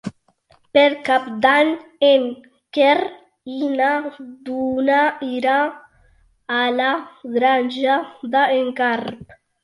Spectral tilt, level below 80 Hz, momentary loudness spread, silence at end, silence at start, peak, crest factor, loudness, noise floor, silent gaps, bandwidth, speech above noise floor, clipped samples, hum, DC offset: -5 dB/octave; -62 dBFS; 13 LU; 0.4 s; 0.05 s; -2 dBFS; 18 dB; -19 LUFS; -58 dBFS; none; 11.5 kHz; 39 dB; under 0.1%; none; under 0.1%